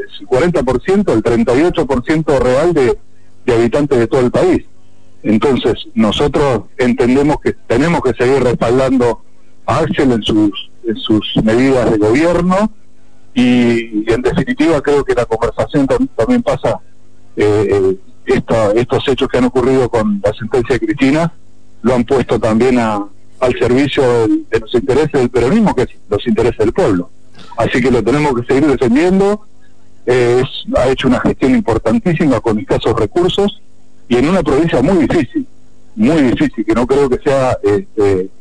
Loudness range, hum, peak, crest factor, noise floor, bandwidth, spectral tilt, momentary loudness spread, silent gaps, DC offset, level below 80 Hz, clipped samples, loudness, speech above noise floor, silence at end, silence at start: 1 LU; none; 0 dBFS; 12 dB; -49 dBFS; 10.5 kHz; -6.5 dB/octave; 6 LU; none; 3%; -34 dBFS; under 0.1%; -13 LUFS; 37 dB; 0.15 s; 0 s